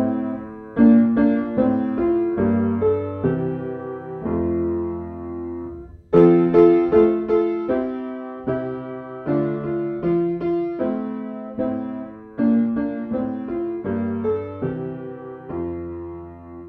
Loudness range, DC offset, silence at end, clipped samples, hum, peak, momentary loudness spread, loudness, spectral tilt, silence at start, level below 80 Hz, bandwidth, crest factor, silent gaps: 7 LU; under 0.1%; 0 s; under 0.1%; none; -2 dBFS; 17 LU; -21 LUFS; -11 dB/octave; 0 s; -48 dBFS; 4.5 kHz; 18 dB; none